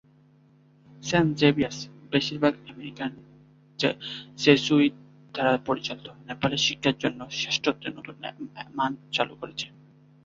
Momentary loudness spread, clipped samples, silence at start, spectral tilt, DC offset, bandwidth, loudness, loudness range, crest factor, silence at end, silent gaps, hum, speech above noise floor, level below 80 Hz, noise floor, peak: 17 LU; under 0.1%; 1 s; -4.5 dB/octave; under 0.1%; 7.6 kHz; -26 LUFS; 3 LU; 24 dB; 0.6 s; none; none; 32 dB; -62 dBFS; -58 dBFS; -4 dBFS